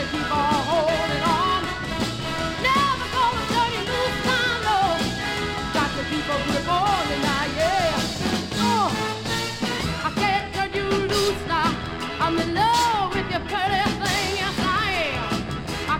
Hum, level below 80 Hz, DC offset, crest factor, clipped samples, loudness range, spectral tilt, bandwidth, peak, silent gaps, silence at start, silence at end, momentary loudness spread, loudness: none; -40 dBFS; under 0.1%; 16 dB; under 0.1%; 1 LU; -4 dB/octave; 16.5 kHz; -8 dBFS; none; 0 s; 0 s; 5 LU; -23 LUFS